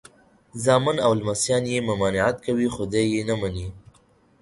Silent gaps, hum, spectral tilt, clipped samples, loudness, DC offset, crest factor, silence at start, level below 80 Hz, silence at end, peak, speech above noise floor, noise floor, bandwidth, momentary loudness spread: none; none; -5 dB/octave; under 0.1%; -23 LUFS; under 0.1%; 20 dB; 0.55 s; -48 dBFS; 0.6 s; -4 dBFS; 36 dB; -59 dBFS; 11.5 kHz; 9 LU